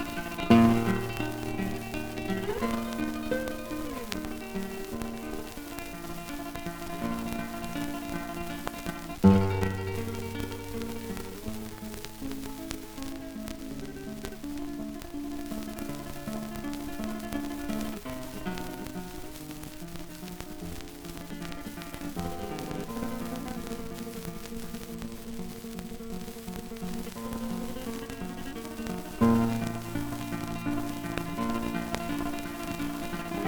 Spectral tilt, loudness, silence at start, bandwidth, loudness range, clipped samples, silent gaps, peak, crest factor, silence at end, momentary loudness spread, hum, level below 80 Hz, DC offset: -6 dB/octave; -33 LUFS; 0 s; over 20 kHz; 10 LU; under 0.1%; none; -6 dBFS; 26 dB; 0 s; 10 LU; none; -46 dBFS; under 0.1%